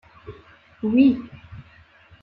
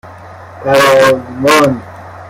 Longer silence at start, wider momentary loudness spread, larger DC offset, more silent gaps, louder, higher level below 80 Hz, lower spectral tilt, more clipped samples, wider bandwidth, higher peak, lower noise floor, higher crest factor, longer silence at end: first, 0.25 s vs 0.05 s; first, 26 LU vs 15 LU; neither; neither; second, -20 LUFS vs -9 LUFS; second, -54 dBFS vs -48 dBFS; first, -9.5 dB/octave vs -4 dB/octave; neither; second, 4.7 kHz vs 16.5 kHz; second, -6 dBFS vs 0 dBFS; first, -52 dBFS vs -32 dBFS; first, 18 dB vs 12 dB; first, 0.6 s vs 0 s